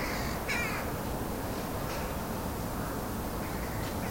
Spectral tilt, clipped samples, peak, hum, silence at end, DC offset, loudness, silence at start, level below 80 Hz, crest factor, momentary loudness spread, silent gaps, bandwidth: -5 dB/octave; under 0.1%; -18 dBFS; none; 0 s; under 0.1%; -34 LUFS; 0 s; -42 dBFS; 16 dB; 4 LU; none; 16.5 kHz